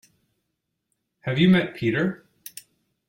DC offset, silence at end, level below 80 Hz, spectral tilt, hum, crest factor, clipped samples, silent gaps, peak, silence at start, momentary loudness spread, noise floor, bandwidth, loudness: under 0.1%; 0.95 s; -60 dBFS; -6.5 dB/octave; none; 18 dB; under 0.1%; none; -8 dBFS; 1.25 s; 22 LU; -79 dBFS; 16.5 kHz; -22 LUFS